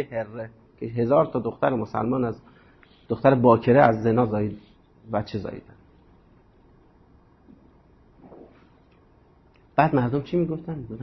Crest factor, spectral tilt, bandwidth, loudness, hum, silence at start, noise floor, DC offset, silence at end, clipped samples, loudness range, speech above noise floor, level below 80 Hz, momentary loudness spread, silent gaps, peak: 22 dB; -10 dB/octave; 6 kHz; -23 LUFS; none; 0 s; -56 dBFS; under 0.1%; 0 s; under 0.1%; 15 LU; 34 dB; -54 dBFS; 19 LU; none; -2 dBFS